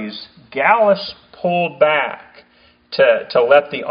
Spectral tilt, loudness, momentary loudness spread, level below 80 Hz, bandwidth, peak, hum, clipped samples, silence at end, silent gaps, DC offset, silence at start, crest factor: -2 dB/octave; -15 LUFS; 16 LU; -62 dBFS; 5.2 kHz; 0 dBFS; none; under 0.1%; 0 s; none; under 0.1%; 0 s; 16 dB